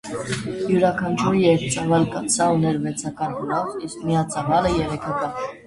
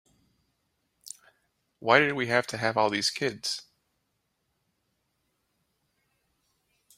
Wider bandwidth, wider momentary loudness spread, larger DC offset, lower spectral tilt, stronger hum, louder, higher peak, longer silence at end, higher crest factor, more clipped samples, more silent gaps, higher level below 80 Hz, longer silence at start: second, 11.5 kHz vs 16 kHz; second, 9 LU vs 23 LU; neither; first, -5 dB/octave vs -3.5 dB/octave; neither; first, -22 LUFS vs -26 LUFS; about the same, -4 dBFS vs -4 dBFS; second, 0.05 s vs 3.35 s; second, 18 dB vs 28 dB; neither; neither; first, -46 dBFS vs -72 dBFS; second, 0.05 s vs 1.05 s